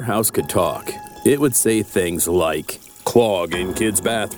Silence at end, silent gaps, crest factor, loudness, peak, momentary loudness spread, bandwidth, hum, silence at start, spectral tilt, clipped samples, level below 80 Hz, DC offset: 0 s; none; 18 dB; -19 LUFS; -2 dBFS; 11 LU; over 20 kHz; none; 0 s; -4 dB/octave; under 0.1%; -48 dBFS; under 0.1%